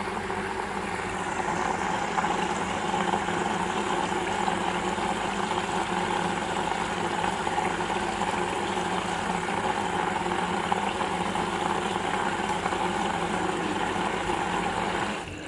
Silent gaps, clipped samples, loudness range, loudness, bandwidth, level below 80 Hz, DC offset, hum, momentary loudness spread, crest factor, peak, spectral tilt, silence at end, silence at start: none; under 0.1%; 1 LU; -28 LUFS; 11.5 kHz; -50 dBFS; under 0.1%; none; 2 LU; 18 dB; -10 dBFS; -4 dB/octave; 0 s; 0 s